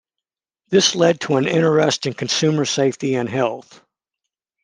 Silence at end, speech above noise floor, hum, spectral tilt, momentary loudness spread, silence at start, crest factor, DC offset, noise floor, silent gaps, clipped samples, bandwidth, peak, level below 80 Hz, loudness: 1.05 s; 68 dB; none; -4 dB/octave; 7 LU; 0.7 s; 18 dB; under 0.1%; -86 dBFS; none; under 0.1%; 10.5 kHz; -2 dBFS; -64 dBFS; -18 LUFS